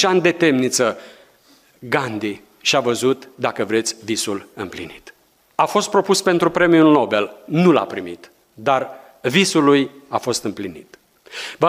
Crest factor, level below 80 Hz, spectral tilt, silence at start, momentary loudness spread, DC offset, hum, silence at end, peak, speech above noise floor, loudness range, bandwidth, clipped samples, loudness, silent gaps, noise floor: 16 dB; -60 dBFS; -4 dB/octave; 0 s; 16 LU; under 0.1%; none; 0 s; -2 dBFS; 35 dB; 5 LU; 16 kHz; under 0.1%; -18 LUFS; none; -54 dBFS